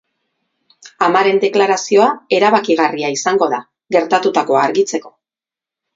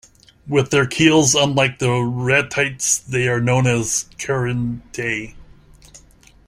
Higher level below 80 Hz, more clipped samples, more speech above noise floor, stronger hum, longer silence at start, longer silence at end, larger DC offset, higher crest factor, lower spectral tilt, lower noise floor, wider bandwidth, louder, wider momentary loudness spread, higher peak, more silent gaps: second, -66 dBFS vs -48 dBFS; neither; first, 75 dB vs 31 dB; neither; first, 0.85 s vs 0.45 s; first, 0.85 s vs 0.5 s; neither; about the same, 16 dB vs 18 dB; about the same, -3.5 dB/octave vs -4 dB/octave; first, -89 dBFS vs -49 dBFS; second, 7.8 kHz vs 15 kHz; first, -14 LUFS vs -18 LUFS; second, 5 LU vs 10 LU; about the same, 0 dBFS vs 0 dBFS; neither